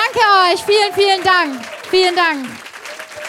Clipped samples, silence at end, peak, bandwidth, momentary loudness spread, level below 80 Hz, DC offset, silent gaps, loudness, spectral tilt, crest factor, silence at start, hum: under 0.1%; 0 s; 0 dBFS; 16 kHz; 19 LU; -58 dBFS; under 0.1%; none; -13 LUFS; -2 dB/octave; 14 dB; 0 s; none